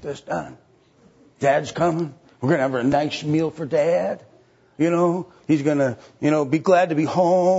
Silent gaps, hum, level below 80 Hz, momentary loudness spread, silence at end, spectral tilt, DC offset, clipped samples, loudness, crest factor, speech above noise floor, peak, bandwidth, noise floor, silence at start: none; none; -60 dBFS; 11 LU; 0 s; -6.5 dB/octave; under 0.1%; under 0.1%; -21 LUFS; 18 dB; 35 dB; -4 dBFS; 8 kHz; -55 dBFS; 0 s